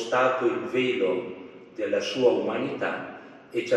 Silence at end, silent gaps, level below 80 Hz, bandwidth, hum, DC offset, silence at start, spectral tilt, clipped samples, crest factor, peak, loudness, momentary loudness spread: 0 s; none; -78 dBFS; 9.6 kHz; none; under 0.1%; 0 s; -5 dB/octave; under 0.1%; 18 dB; -8 dBFS; -26 LUFS; 17 LU